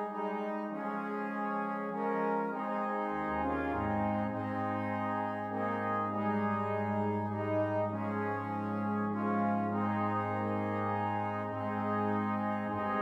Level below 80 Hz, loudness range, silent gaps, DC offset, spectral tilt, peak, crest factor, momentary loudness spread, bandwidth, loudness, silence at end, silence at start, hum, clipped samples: -62 dBFS; 1 LU; none; under 0.1%; -9 dB/octave; -20 dBFS; 14 dB; 4 LU; 5.6 kHz; -34 LUFS; 0 s; 0 s; none; under 0.1%